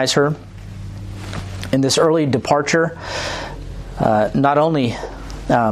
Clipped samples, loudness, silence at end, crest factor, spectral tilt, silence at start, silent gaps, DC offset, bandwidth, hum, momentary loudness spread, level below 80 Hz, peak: under 0.1%; -18 LUFS; 0 s; 16 dB; -5 dB/octave; 0 s; none; under 0.1%; 14.5 kHz; none; 17 LU; -38 dBFS; -2 dBFS